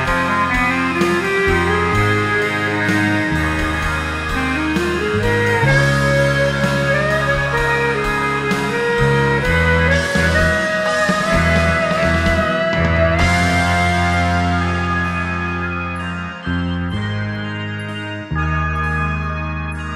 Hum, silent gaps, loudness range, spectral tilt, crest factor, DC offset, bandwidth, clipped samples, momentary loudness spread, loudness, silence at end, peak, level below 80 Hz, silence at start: none; none; 6 LU; -5.5 dB/octave; 16 dB; under 0.1%; 15 kHz; under 0.1%; 8 LU; -17 LUFS; 0 s; -2 dBFS; -28 dBFS; 0 s